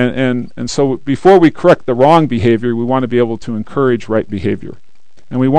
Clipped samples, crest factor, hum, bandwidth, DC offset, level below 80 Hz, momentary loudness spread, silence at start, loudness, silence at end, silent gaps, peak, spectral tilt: 0.9%; 12 dB; none; 9.4 kHz; 4%; -44 dBFS; 11 LU; 0 s; -13 LUFS; 0 s; none; 0 dBFS; -7 dB/octave